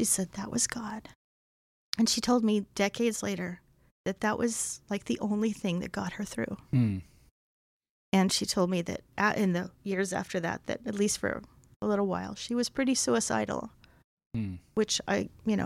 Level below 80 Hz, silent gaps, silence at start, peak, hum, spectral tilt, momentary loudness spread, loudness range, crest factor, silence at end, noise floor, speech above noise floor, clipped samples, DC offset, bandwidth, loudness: -60 dBFS; 1.15-1.93 s, 3.91-4.04 s, 7.31-7.80 s, 7.89-8.12 s, 11.76-11.80 s, 14.04-14.17 s, 14.26-14.30 s; 0 s; -8 dBFS; none; -4 dB/octave; 11 LU; 3 LU; 22 dB; 0 s; under -90 dBFS; over 60 dB; under 0.1%; under 0.1%; 16 kHz; -30 LUFS